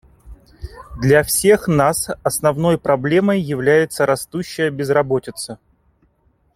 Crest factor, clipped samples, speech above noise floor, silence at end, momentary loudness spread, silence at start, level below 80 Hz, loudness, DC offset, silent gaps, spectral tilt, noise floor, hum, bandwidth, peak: 16 dB; under 0.1%; 44 dB; 1 s; 16 LU; 0.25 s; -44 dBFS; -17 LUFS; under 0.1%; none; -5 dB/octave; -60 dBFS; none; 16.5 kHz; -2 dBFS